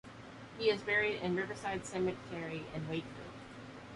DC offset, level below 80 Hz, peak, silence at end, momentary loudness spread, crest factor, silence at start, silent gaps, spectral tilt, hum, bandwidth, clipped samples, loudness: under 0.1%; -64 dBFS; -18 dBFS; 0 s; 18 LU; 20 dB; 0.05 s; none; -5 dB/octave; none; 11.5 kHz; under 0.1%; -36 LUFS